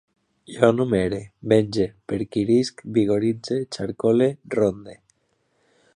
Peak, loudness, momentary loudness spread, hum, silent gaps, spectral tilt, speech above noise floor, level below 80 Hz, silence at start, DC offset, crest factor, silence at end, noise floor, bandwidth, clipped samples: -2 dBFS; -22 LUFS; 9 LU; none; none; -7 dB/octave; 47 dB; -54 dBFS; 0.5 s; under 0.1%; 22 dB; 1.05 s; -69 dBFS; 10.5 kHz; under 0.1%